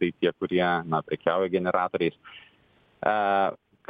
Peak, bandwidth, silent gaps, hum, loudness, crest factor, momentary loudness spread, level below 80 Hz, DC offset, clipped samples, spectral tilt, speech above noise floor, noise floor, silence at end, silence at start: -10 dBFS; 4.9 kHz; none; none; -26 LUFS; 18 dB; 5 LU; -64 dBFS; under 0.1%; under 0.1%; -9 dB/octave; 36 dB; -62 dBFS; 0.35 s; 0 s